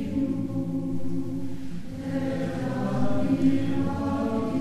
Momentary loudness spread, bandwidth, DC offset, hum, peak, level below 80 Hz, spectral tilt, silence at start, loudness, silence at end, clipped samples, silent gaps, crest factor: 10 LU; 12.5 kHz; under 0.1%; none; -10 dBFS; -46 dBFS; -8 dB/octave; 0 s; -28 LUFS; 0 s; under 0.1%; none; 14 dB